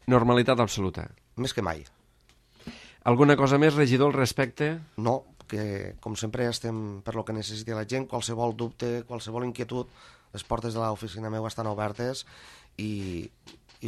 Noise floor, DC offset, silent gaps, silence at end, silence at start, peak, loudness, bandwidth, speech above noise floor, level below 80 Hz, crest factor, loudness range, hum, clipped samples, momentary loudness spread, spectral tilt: -62 dBFS; under 0.1%; none; 0 s; 0.05 s; -4 dBFS; -28 LUFS; 14.5 kHz; 35 dB; -54 dBFS; 22 dB; 9 LU; none; under 0.1%; 18 LU; -6 dB/octave